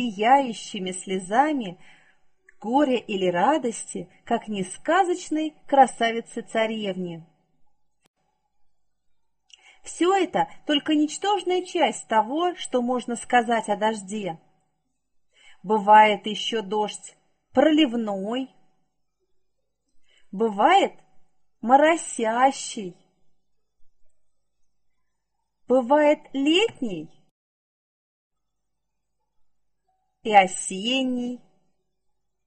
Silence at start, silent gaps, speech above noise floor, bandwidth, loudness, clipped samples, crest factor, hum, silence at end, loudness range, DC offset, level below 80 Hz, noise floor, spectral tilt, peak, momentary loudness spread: 0 s; 8.07-8.14 s, 27.31-28.30 s; 60 dB; 8.8 kHz; -23 LUFS; under 0.1%; 22 dB; none; 1.1 s; 7 LU; 0.1%; -68 dBFS; -82 dBFS; -3.5 dB/octave; -4 dBFS; 15 LU